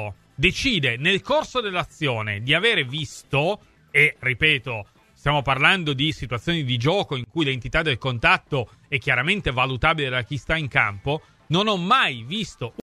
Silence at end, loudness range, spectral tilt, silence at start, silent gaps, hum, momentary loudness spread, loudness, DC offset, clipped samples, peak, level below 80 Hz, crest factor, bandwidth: 0.15 s; 2 LU; -5 dB/octave; 0 s; none; none; 10 LU; -21 LUFS; under 0.1%; under 0.1%; -2 dBFS; -42 dBFS; 22 dB; 14 kHz